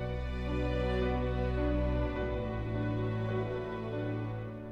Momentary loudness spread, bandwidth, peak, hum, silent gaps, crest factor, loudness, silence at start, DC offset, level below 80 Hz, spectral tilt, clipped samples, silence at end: 5 LU; 6.2 kHz; -20 dBFS; none; none; 12 dB; -34 LUFS; 0 s; under 0.1%; -38 dBFS; -8.5 dB/octave; under 0.1%; 0 s